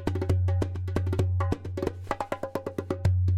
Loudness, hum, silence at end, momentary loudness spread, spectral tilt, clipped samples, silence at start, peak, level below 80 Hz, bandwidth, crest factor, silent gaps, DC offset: -29 LUFS; none; 0 s; 7 LU; -8 dB/octave; under 0.1%; 0 s; -12 dBFS; -42 dBFS; 9 kHz; 16 dB; none; under 0.1%